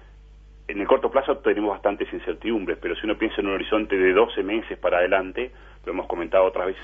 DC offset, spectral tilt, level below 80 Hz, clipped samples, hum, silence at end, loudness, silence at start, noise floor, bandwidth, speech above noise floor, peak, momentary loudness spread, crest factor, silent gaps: under 0.1%; -7.5 dB/octave; -46 dBFS; under 0.1%; 50 Hz at -45 dBFS; 0 s; -23 LUFS; 0 s; -47 dBFS; 3.8 kHz; 24 dB; -4 dBFS; 11 LU; 20 dB; none